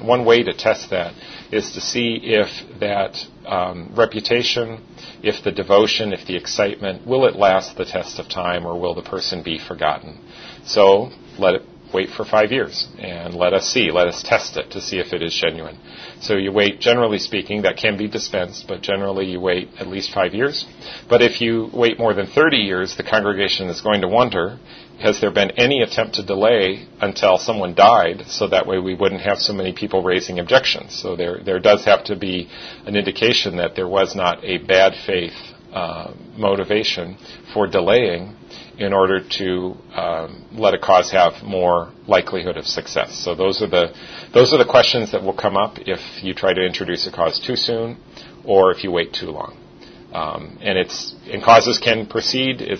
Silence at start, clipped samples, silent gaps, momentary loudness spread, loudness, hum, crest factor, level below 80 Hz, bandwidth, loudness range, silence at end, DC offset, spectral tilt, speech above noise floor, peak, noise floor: 0 s; under 0.1%; none; 13 LU; -18 LUFS; none; 18 dB; -52 dBFS; 6.6 kHz; 4 LU; 0 s; under 0.1%; -4 dB/octave; 24 dB; 0 dBFS; -42 dBFS